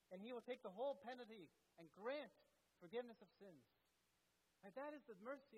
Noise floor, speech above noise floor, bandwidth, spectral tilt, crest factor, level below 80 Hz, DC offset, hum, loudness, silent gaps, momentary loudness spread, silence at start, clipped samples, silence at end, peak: -85 dBFS; 30 dB; 12 kHz; -5.5 dB/octave; 18 dB; under -90 dBFS; under 0.1%; none; -54 LUFS; none; 18 LU; 0.1 s; under 0.1%; 0 s; -38 dBFS